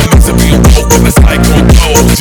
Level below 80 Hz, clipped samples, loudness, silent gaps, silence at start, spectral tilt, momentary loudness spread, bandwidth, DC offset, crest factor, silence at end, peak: -8 dBFS; 5%; -6 LUFS; none; 0 s; -5 dB/octave; 1 LU; over 20 kHz; under 0.1%; 4 dB; 0 s; 0 dBFS